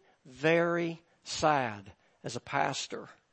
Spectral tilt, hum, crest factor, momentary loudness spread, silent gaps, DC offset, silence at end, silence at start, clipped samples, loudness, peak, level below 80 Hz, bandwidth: -4.5 dB/octave; none; 22 dB; 18 LU; none; under 0.1%; 0.2 s; 0.25 s; under 0.1%; -31 LUFS; -12 dBFS; -68 dBFS; 8.8 kHz